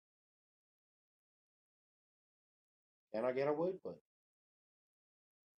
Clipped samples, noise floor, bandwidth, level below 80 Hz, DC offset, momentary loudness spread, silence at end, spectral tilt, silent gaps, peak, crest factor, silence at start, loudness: under 0.1%; under -90 dBFS; 8.8 kHz; under -90 dBFS; under 0.1%; 15 LU; 1.6 s; -8.5 dB/octave; none; -24 dBFS; 22 dB; 3.15 s; -40 LUFS